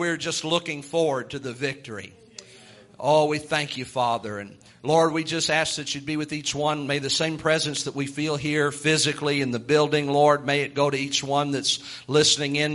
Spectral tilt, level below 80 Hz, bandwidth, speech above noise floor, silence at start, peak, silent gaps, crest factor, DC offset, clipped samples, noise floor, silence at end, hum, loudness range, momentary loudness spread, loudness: -3.5 dB/octave; -62 dBFS; 11.5 kHz; 25 dB; 0 s; -4 dBFS; none; 20 dB; under 0.1%; under 0.1%; -49 dBFS; 0 s; none; 5 LU; 10 LU; -23 LUFS